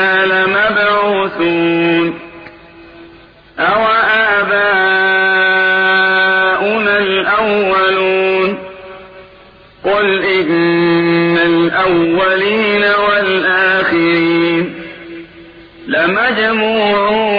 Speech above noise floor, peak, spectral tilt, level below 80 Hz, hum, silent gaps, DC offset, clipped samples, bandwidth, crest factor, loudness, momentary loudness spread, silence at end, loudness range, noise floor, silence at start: 29 dB; -2 dBFS; -7.5 dB/octave; -48 dBFS; none; none; under 0.1%; under 0.1%; 5.2 kHz; 10 dB; -12 LUFS; 8 LU; 0 s; 4 LU; -41 dBFS; 0 s